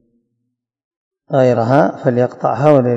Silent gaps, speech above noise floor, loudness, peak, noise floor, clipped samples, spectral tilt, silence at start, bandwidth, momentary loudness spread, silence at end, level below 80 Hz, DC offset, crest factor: none; 60 dB; -14 LUFS; 0 dBFS; -73 dBFS; 0.3%; -8.5 dB/octave; 1.3 s; 8 kHz; 5 LU; 0 s; -60 dBFS; under 0.1%; 16 dB